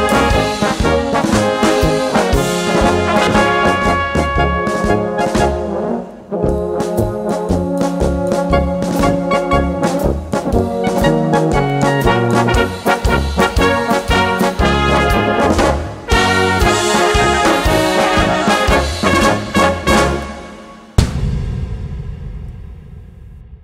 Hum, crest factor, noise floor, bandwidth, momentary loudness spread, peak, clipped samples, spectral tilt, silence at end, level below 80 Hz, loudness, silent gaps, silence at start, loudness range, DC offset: none; 14 dB; -35 dBFS; 16 kHz; 8 LU; 0 dBFS; under 0.1%; -5 dB/octave; 0.05 s; -24 dBFS; -14 LUFS; none; 0 s; 5 LU; under 0.1%